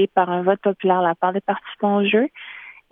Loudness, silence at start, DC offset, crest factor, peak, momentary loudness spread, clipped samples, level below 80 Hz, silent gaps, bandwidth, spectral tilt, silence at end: -20 LUFS; 0 s; under 0.1%; 16 dB; -4 dBFS; 13 LU; under 0.1%; -72 dBFS; none; 3.8 kHz; -9.5 dB/octave; 0.2 s